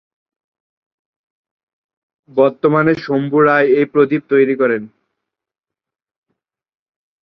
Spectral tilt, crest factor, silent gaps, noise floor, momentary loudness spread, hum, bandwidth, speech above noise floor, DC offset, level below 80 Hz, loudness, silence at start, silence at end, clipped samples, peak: -9 dB/octave; 16 dB; none; -86 dBFS; 6 LU; none; 6 kHz; 72 dB; under 0.1%; -60 dBFS; -14 LUFS; 2.35 s; 2.35 s; under 0.1%; -2 dBFS